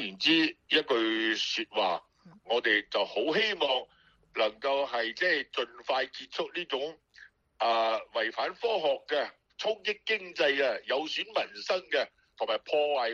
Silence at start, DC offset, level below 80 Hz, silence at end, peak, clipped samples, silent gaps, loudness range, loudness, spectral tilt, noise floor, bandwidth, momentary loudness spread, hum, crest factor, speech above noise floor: 0 s; under 0.1%; -76 dBFS; 0 s; -10 dBFS; under 0.1%; none; 3 LU; -30 LUFS; -3 dB/octave; -57 dBFS; 7.4 kHz; 9 LU; none; 20 dB; 27 dB